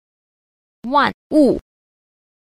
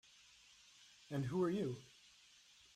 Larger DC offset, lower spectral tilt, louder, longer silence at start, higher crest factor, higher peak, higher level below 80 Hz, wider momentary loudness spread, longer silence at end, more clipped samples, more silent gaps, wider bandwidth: neither; about the same, -6 dB/octave vs -7 dB/octave; first, -17 LUFS vs -42 LUFS; about the same, 0.85 s vs 0.8 s; about the same, 18 dB vs 18 dB; first, -4 dBFS vs -28 dBFS; first, -48 dBFS vs -78 dBFS; second, 10 LU vs 25 LU; about the same, 1 s vs 0.9 s; neither; first, 1.14-1.30 s vs none; second, 11.5 kHz vs 14 kHz